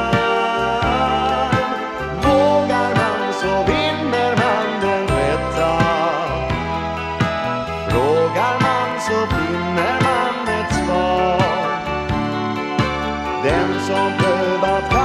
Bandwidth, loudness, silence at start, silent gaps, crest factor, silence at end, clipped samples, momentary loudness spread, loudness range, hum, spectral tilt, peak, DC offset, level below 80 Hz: 14.5 kHz; -18 LUFS; 0 s; none; 16 dB; 0 s; under 0.1%; 5 LU; 2 LU; none; -5.5 dB/octave; -2 dBFS; under 0.1%; -34 dBFS